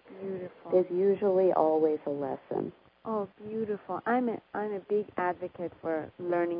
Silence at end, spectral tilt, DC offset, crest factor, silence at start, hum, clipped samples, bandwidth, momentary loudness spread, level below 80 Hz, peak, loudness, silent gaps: 0 s; -11 dB/octave; under 0.1%; 20 dB; 0.05 s; none; under 0.1%; 5.2 kHz; 13 LU; -72 dBFS; -10 dBFS; -31 LUFS; none